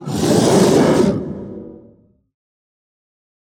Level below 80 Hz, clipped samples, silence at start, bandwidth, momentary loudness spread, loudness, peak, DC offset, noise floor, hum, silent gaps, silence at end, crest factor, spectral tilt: -46 dBFS; under 0.1%; 0 s; 18 kHz; 19 LU; -14 LUFS; -2 dBFS; under 0.1%; -50 dBFS; none; none; 1.85 s; 16 dB; -5.5 dB/octave